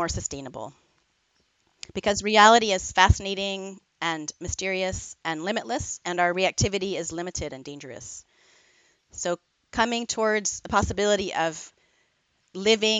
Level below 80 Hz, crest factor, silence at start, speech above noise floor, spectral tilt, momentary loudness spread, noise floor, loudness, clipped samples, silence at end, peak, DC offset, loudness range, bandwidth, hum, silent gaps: -42 dBFS; 24 dB; 0 s; 45 dB; -3 dB/octave; 19 LU; -70 dBFS; -24 LUFS; under 0.1%; 0 s; -2 dBFS; under 0.1%; 8 LU; 9.4 kHz; none; none